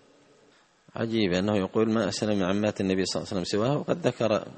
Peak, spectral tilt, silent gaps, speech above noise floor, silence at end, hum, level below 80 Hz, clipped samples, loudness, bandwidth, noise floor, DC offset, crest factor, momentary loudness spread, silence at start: -8 dBFS; -5.5 dB/octave; none; 35 dB; 0 s; none; -62 dBFS; under 0.1%; -27 LUFS; 8.8 kHz; -61 dBFS; under 0.1%; 18 dB; 4 LU; 0.95 s